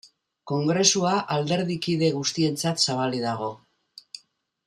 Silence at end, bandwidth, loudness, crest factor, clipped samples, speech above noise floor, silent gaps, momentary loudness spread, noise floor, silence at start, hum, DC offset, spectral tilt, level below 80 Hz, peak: 0.5 s; 14.5 kHz; -24 LUFS; 20 dB; under 0.1%; 37 dB; none; 18 LU; -61 dBFS; 0.05 s; none; under 0.1%; -4 dB/octave; -66 dBFS; -6 dBFS